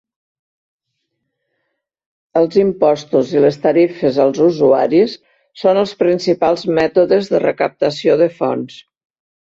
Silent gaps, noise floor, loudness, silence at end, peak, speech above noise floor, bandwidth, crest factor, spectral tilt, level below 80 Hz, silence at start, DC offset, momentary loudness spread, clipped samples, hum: none; -73 dBFS; -15 LUFS; 0.75 s; -2 dBFS; 59 dB; 7.8 kHz; 14 dB; -6.5 dB/octave; -58 dBFS; 2.35 s; under 0.1%; 6 LU; under 0.1%; none